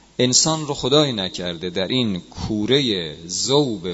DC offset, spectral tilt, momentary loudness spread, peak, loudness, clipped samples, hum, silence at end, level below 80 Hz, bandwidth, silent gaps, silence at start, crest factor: under 0.1%; -3.5 dB/octave; 10 LU; -2 dBFS; -20 LUFS; under 0.1%; none; 0 s; -48 dBFS; 8.2 kHz; none; 0.2 s; 20 dB